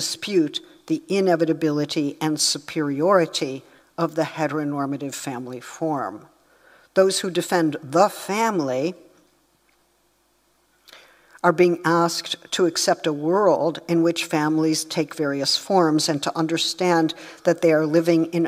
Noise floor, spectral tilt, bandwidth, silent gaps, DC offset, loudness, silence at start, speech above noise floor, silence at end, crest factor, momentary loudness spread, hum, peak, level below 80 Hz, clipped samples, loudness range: -64 dBFS; -4.5 dB/octave; 16 kHz; none; under 0.1%; -22 LUFS; 0 s; 43 dB; 0 s; 20 dB; 9 LU; none; -2 dBFS; -72 dBFS; under 0.1%; 6 LU